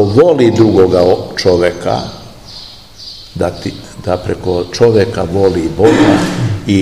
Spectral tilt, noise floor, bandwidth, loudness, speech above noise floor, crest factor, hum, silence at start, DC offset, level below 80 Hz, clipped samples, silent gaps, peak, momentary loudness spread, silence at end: -6.5 dB/octave; -33 dBFS; 13.5 kHz; -11 LUFS; 22 dB; 12 dB; none; 0 s; 0.8%; -36 dBFS; 1%; none; 0 dBFS; 21 LU; 0 s